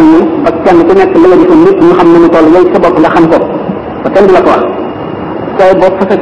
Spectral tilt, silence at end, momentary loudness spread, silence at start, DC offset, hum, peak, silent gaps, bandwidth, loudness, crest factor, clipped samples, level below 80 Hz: -7.5 dB/octave; 0 s; 12 LU; 0 s; 2%; none; 0 dBFS; none; 7.8 kHz; -5 LUFS; 6 dB; 20%; -34 dBFS